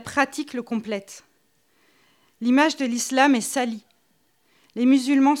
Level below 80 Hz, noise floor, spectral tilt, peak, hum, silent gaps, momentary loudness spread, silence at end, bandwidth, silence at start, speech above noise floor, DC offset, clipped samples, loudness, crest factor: -72 dBFS; -66 dBFS; -3 dB/octave; -4 dBFS; none; none; 14 LU; 0 s; 15 kHz; 0 s; 45 dB; under 0.1%; under 0.1%; -22 LUFS; 20 dB